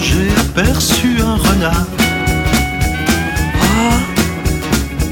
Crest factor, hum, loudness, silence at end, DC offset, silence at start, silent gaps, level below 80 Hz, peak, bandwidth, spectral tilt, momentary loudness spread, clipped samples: 12 dB; none; -14 LUFS; 0 s; 0.1%; 0 s; none; -20 dBFS; -2 dBFS; 19 kHz; -4.5 dB/octave; 4 LU; under 0.1%